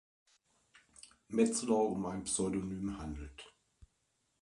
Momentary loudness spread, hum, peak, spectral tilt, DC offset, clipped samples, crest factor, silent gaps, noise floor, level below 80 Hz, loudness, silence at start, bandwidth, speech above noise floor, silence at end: 25 LU; none; -16 dBFS; -5 dB/octave; under 0.1%; under 0.1%; 22 dB; none; -80 dBFS; -58 dBFS; -35 LUFS; 1.05 s; 11.5 kHz; 45 dB; 0.55 s